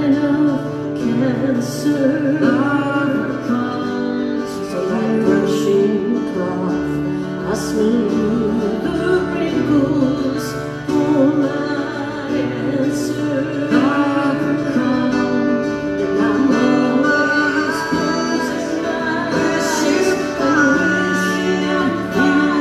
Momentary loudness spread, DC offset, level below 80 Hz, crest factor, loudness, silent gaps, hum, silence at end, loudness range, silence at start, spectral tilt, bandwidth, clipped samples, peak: 6 LU; under 0.1%; -46 dBFS; 14 dB; -17 LUFS; none; none; 0 s; 2 LU; 0 s; -5.5 dB/octave; 13.5 kHz; under 0.1%; -2 dBFS